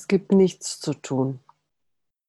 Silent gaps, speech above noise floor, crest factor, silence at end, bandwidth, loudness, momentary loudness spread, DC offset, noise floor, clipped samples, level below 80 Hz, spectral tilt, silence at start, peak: none; 57 dB; 16 dB; 0.9 s; 12 kHz; -23 LUFS; 11 LU; under 0.1%; -79 dBFS; under 0.1%; -64 dBFS; -6 dB/octave; 0 s; -8 dBFS